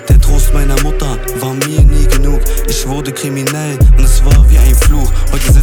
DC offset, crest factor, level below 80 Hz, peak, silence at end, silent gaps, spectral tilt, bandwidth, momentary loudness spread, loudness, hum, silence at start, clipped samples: under 0.1%; 8 dB; -8 dBFS; 0 dBFS; 0 s; none; -5 dB/octave; 19 kHz; 9 LU; -12 LUFS; none; 0 s; under 0.1%